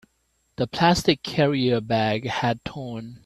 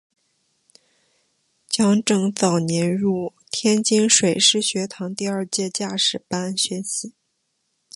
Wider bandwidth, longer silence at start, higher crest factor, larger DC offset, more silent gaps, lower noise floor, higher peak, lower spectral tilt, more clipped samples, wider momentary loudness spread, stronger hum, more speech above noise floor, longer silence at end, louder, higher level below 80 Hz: first, 13.5 kHz vs 11.5 kHz; second, 0.6 s vs 1.7 s; about the same, 20 dB vs 20 dB; neither; neither; about the same, -69 dBFS vs -72 dBFS; about the same, -4 dBFS vs -2 dBFS; first, -5.5 dB/octave vs -3.5 dB/octave; neither; about the same, 12 LU vs 12 LU; neither; second, 46 dB vs 52 dB; second, 0.1 s vs 0.85 s; second, -23 LUFS vs -20 LUFS; first, -50 dBFS vs -64 dBFS